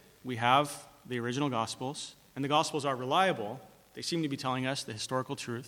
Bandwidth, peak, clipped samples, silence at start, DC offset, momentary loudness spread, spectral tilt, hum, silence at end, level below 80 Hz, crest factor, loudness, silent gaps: 19 kHz; -10 dBFS; under 0.1%; 0.25 s; under 0.1%; 14 LU; -4.5 dB/octave; none; 0 s; -72 dBFS; 22 dB; -32 LUFS; none